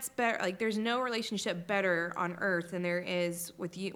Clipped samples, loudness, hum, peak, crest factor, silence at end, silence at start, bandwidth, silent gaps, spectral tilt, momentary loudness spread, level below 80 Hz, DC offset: under 0.1%; -33 LUFS; none; -16 dBFS; 18 dB; 0 s; 0 s; 18.5 kHz; none; -4 dB/octave; 5 LU; -74 dBFS; under 0.1%